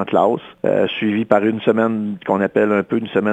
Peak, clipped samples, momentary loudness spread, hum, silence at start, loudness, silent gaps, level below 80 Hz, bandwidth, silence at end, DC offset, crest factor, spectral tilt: 0 dBFS; under 0.1%; 4 LU; none; 0 s; -18 LUFS; none; -64 dBFS; 8 kHz; 0 s; under 0.1%; 16 dB; -8 dB/octave